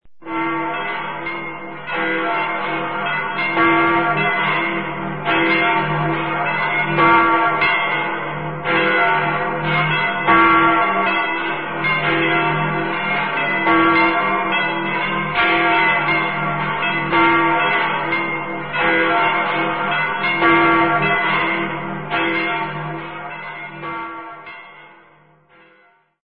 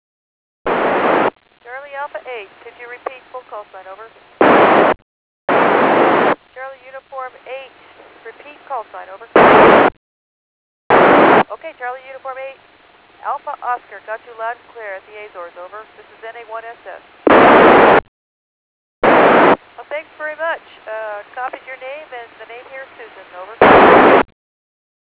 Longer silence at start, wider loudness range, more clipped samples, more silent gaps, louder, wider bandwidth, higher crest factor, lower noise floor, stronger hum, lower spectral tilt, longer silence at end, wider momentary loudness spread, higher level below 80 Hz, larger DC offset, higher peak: second, 0 s vs 0.65 s; second, 6 LU vs 15 LU; neither; second, none vs 5.02-5.48 s, 9.97-10.90 s, 18.08-19.02 s; second, -17 LUFS vs -12 LUFS; first, 5.2 kHz vs 4 kHz; about the same, 18 dB vs 16 dB; first, -55 dBFS vs -48 dBFS; neither; about the same, -9 dB/octave vs -9 dB/octave; second, 0 s vs 0.9 s; second, 12 LU vs 25 LU; about the same, -52 dBFS vs -50 dBFS; first, 1% vs under 0.1%; about the same, 0 dBFS vs 0 dBFS